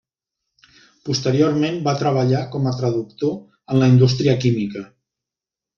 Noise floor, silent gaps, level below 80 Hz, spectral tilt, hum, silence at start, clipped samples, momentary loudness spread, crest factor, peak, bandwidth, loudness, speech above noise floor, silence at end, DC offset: -88 dBFS; none; -56 dBFS; -7 dB/octave; none; 1.05 s; under 0.1%; 10 LU; 16 dB; -4 dBFS; 7 kHz; -19 LUFS; 70 dB; 0.9 s; under 0.1%